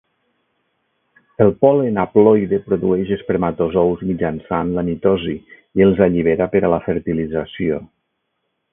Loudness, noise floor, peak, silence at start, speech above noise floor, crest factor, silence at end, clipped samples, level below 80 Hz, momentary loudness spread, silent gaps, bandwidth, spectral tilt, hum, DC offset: -17 LUFS; -72 dBFS; 0 dBFS; 1.4 s; 56 dB; 18 dB; 0.9 s; under 0.1%; -44 dBFS; 9 LU; none; 3.7 kHz; -12.5 dB/octave; none; under 0.1%